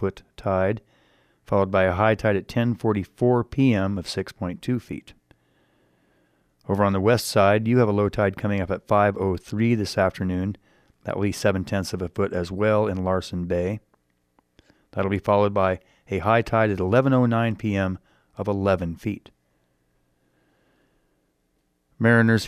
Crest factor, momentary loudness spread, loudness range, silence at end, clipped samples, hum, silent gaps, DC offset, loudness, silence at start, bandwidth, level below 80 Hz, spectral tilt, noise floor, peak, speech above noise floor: 18 dB; 12 LU; 7 LU; 0 s; under 0.1%; none; none; under 0.1%; -23 LUFS; 0 s; 15 kHz; -52 dBFS; -7 dB/octave; -70 dBFS; -6 dBFS; 48 dB